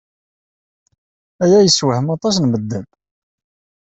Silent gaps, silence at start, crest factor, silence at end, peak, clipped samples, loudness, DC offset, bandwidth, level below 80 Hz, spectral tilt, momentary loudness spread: none; 1.4 s; 16 dB; 1.15 s; -2 dBFS; under 0.1%; -15 LUFS; under 0.1%; 8.4 kHz; -56 dBFS; -5 dB/octave; 13 LU